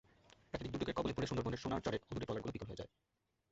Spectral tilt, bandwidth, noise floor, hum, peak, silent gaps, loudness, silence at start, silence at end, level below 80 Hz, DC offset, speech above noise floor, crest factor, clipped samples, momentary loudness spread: -5.5 dB/octave; 8 kHz; -85 dBFS; none; -24 dBFS; none; -42 LUFS; 0.55 s; 0.65 s; -60 dBFS; under 0.1%; 43 dB; 20 dB; under 0.1%; 10 LU